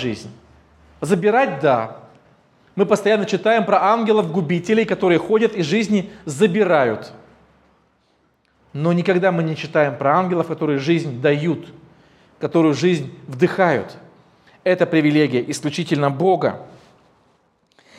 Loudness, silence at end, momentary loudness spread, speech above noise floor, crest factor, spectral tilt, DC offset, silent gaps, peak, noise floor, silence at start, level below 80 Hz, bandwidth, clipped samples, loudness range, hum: -18 LUFS; 1.3 s; 10 LU; 44 dB; 18 dB; -6.5 dB/octave; under 0.1%; none; -2 dBFS; -62 dBFS; 0 s; -62 dBFS; 13 kHz; under 0.1%; 4 LU; none